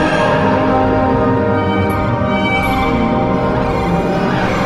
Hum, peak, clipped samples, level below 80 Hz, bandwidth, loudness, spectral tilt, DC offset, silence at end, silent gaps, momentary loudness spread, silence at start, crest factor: none; -2 dBFS; under 0.1%; -28 dBFS; 12.5 kHz; -14 LUFS; -7 dB/octave; under 0.1%; 0 s; none; 3 LU; 0 s; 12 dB